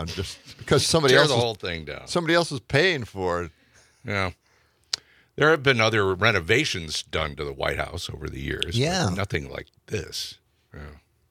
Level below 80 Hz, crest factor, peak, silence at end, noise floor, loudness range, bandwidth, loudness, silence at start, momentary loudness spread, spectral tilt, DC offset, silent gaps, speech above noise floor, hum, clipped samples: -48 dBFS; 24 dB; -2 dBFS; 0.35 s; -63 dBFS; 6 LU; 16 kHz; -24 LUFS; 0 s; 16 LU; -4 dB/octave; under 0.1%; none; 39 dB; none; under 0.1%